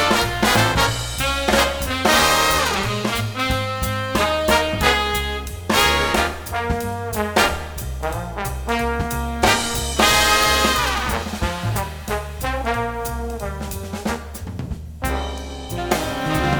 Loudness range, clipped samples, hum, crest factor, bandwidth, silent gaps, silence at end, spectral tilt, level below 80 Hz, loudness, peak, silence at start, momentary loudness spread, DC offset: 8 LU; under 0.1%; none; 20 dB; over 20 kHz; none; 0 s; -3.5 dB/octave; -30 dBFS; -20 LUFS; -2 dBFS; 0 s; 13 LU; under 0.1%